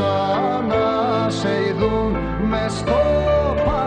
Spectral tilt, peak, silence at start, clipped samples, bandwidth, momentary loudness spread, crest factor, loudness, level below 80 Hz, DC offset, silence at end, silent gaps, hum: -6.5 dB/octave; -4 dBFS; 0 s; under 0.1%; 9.8 kHz; 4 LU; 14 dB; -19 LUFS; -32 dBFS; under 0.1%; 0 s; none; none